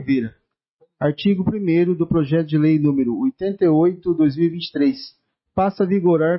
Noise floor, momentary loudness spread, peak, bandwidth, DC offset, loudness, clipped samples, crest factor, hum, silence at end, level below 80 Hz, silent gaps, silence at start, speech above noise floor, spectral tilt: -62 dBFS; 7 LU; -8 dBFS; 5.8 kHz; under 0.1%; -19 LUFS; under 0.1%; 12 dB; none; 0 s; -52 dBFS; 0.69-0.79 s; 0 s; 44 dB; -12 dB/octave